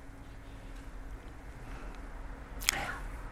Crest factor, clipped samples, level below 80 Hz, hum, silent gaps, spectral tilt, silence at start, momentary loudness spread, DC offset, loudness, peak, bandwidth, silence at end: 38 dB; under 0.1%; -46 dBFS; none; none; -2 dB/octave; 0 s; 18 LU; under 0.1%; -39 LUFS; -2 dBFS; 17 kHz; 0 s